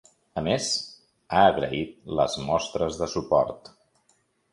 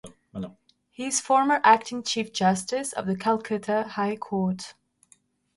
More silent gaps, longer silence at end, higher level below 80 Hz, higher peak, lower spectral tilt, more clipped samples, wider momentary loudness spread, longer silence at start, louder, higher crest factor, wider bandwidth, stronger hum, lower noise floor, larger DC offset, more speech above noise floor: neither; about the same, 0.95 s vs 0.85 s; first, -52 dBFS vs -66 dBFS; about the same, -4 dBFS vs -4 dBFS; about the same, -4 dB/octave vs -4 dB/octave; neither; second, 11 LU vs 19 LU; first, 0.35 s vs 0.05 s; about the same, -25 LUFS vs -25 LUFS; about the same, 22 dB vs 22 dB; about the same, 11.5 kHz vs 11.5 kHz; neither; first, -68 dBFS vs -62 dBFS; neither; first, 43 dB vs 38 dB